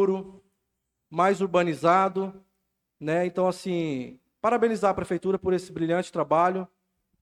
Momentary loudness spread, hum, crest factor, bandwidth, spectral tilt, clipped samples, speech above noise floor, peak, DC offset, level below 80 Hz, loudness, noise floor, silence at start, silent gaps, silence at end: 13 LU; none; 18 dB; 12.5 kHz; -6.5 dB/octave; under 0.1%; 55 dB; -8 dBFS; under 0.1%; -62 dBFS; -26 LUFS; -80 dBFS; 0 s; none; 0.55 s